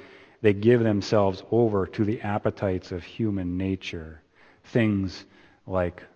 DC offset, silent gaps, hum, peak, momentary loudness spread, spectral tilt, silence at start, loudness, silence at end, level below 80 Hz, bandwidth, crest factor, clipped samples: under 0.1%; none; none; -4 dBFS; 12 LU; -7.5 dB/octave; 0 s; -25 LUFS; 0.1 s; -54 dBFS; 7.4 kHz; 22 dB; under 0.1%